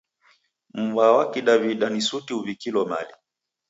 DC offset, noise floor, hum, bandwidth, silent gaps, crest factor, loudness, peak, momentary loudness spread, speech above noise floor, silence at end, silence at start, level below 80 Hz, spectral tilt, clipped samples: under 0.1%; -62 dBFS; none; 8 kHz; none; 20 dB; -22 LUFS; -4 dBFS; 12 LU; 40 dB; 0.6 s; 0.75 s; -74 dBFS; -4 dB/octave; under 0.1%